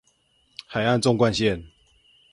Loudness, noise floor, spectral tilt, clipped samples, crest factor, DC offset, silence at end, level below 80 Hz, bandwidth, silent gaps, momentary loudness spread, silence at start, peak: -23 LUFS; -65 dBFS; -5.5 dB/octave; under 0.1%; 20 dB; under 0.1%; 0.65 s; -50 dBFS; 11.5 kHz; none; 20 LU; 0.7 s; -6 dBFS